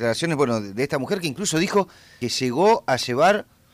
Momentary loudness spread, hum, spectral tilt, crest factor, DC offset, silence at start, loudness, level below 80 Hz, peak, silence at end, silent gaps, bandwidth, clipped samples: 7 LU; none; -4.5 dB/octave; 14 dB; under 0.1%; 0 s; -22 LUFS; -58 dBFS; -8 dBFS; 0.3 s; none; 15.5 kHz; under 0.1%